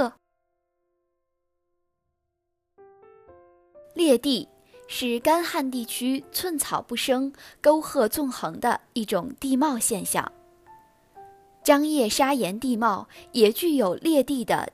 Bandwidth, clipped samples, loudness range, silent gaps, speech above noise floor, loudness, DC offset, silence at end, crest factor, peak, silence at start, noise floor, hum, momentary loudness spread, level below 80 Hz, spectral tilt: 15.5 kHz; under 0.1%; 6 LU; none; 55 dB; -24 LUFS; under 0.1%; 0.05 s; 22 dB; -4 dBFS; 0 s; -79 dBFS; none; 8 LU; -62 dBFS; -3.5 dB/octave